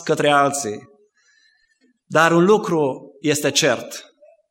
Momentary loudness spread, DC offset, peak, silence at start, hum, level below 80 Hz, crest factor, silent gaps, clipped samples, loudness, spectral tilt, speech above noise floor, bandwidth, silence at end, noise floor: 15 LU; under 0.1%; 0 dBFS; 0 s; none; -70 dBFS; 20 dB; none; under 0.1%; -18 LUFS; -4 dB/octave; 45 dB; 16.5 kHz; 0.5 s; -62 dBFS